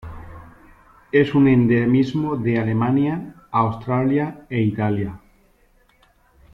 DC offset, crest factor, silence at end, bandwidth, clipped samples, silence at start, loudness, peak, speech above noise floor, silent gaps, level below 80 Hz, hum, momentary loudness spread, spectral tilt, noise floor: under 0.1%; 16 dB; 1.35 s; 6.6 kHz; under 0.1%; 0.05 s; -20 LUFS; -4 dBFS; 39 dB; none; -48 dBFS; none; 10 LU; -9.5 dB/octave; -57 dBFS